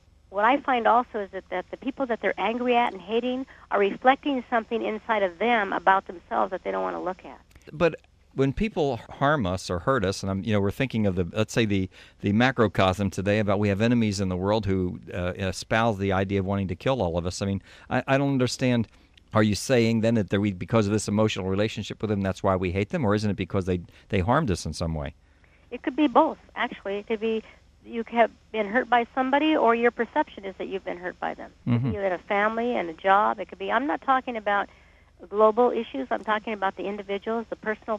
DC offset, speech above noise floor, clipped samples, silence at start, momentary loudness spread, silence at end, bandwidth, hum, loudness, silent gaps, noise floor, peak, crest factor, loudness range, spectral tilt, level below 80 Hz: under 0.1%; 31 dB; under 0.1%; 0.3 s; 10 LU; 0 s; 14 kHz; none; -25 LUFS; none; -56 dBFS; -4 dBFS; 20 dB; 3 LU; -6 dB/octave; -50 dBFS